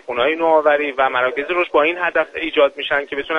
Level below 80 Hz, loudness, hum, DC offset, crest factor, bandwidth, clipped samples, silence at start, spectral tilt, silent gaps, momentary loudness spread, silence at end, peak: -54 dBFS; -17 LUFS; none; under 0.1%; 16 dB; 6.6 kHz; under 0.1%; 0.1 s; -5 dB/octave; none; 5 LU; 0 s; -2 dBFS